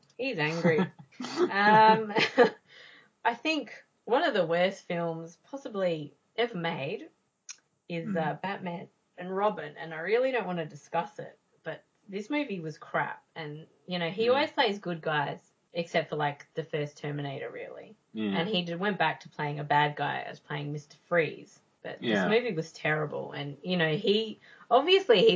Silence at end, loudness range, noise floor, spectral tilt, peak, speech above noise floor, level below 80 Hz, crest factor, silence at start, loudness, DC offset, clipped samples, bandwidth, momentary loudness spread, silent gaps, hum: 0 s; 9 LU; -55 dBFS; -5.5 dB/octave; -8 dBFS; 26 dB; -80 dBFS; 22 dB; 0.2 s; -29 LUFS; under 0.1%; under 0.1%; 7.8 kHz; 17 LU; none; none